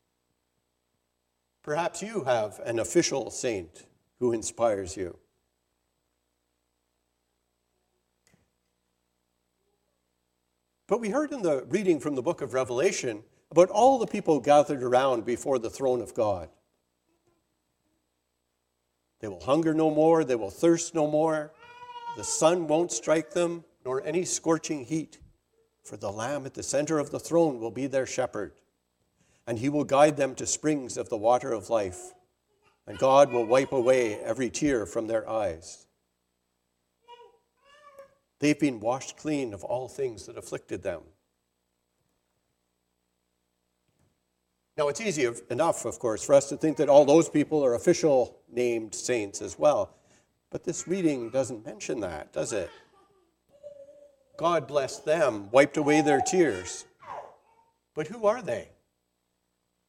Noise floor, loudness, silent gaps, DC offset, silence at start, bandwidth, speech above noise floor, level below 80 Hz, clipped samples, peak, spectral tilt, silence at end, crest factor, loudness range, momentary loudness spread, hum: -78 dBFS; -27 LUFS; none; under 0.1%; 1.65 s; 15 kHz; 52 dB; -66 dBFS; under 0.1%; -6 dBFS; -4.5 dB/octave; 1.25 s; 22 dB; 11 LU; 15 LU; 60 Hz at -65 dBFS